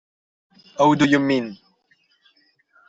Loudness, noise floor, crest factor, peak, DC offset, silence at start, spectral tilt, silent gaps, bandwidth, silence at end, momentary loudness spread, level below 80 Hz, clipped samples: -18 LUFS; -63 dBFS; 18 dB; -4 dBFS; under 0.1%; 0.8 s; -6 dB/octave; none; 7.8 kHz; 1.35 s; 18 LU; -62 dBFS; under 0.1%